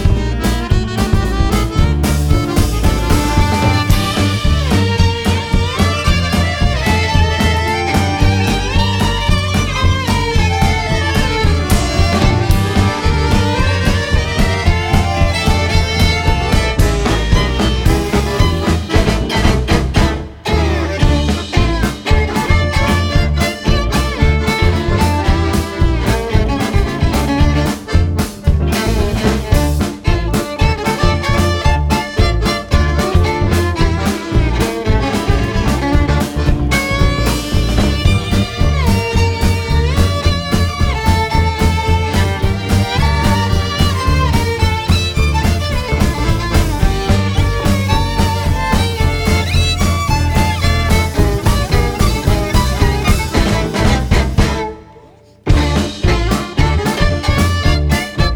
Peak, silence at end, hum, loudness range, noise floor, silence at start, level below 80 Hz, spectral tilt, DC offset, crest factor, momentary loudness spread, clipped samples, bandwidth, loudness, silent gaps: 0 dBFS; 0 s; none; 1 LU; -42 dBFS; 0 s; -18 dBFS; -5.5 dB/octave; under 0.1%; 14 dB; 3 LU; under 0.1%; 19 kHz; -15 LUFS; none